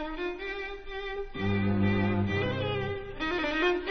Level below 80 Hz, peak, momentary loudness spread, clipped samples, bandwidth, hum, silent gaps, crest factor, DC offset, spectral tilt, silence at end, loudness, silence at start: -46 dBFS; -14 dBFS; 10 LU; under 0.1%; 6.4 kHz; none; none; 14 dB; 0.2%; -7.5 dB/octave; 0 s; -30 LUFS; 0 s